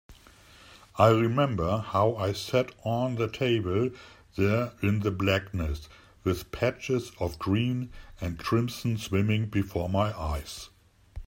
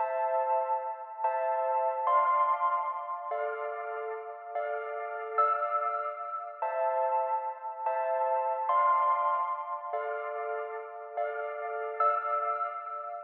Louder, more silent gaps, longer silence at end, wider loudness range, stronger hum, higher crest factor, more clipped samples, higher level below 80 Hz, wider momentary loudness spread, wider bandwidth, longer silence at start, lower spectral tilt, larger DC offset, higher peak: first, -28 LUFS vs -31 LUFS; neither; about the same, 0 s vs 0 s; about the same, 4 LU vs 4 LU; neither; first, 22 dB vs 16 dB; neither; first, -46 dBFS vs under -90 dBFS; about the same, 11 LU vs 10 LU; first, 16 kHz vs 4.2 kHz; about the same, 0.1 s vs 0 s; first, -6.5 dB/octave vs 4 dB/octave; neither; first, -6 dBFS vs -16 dBFS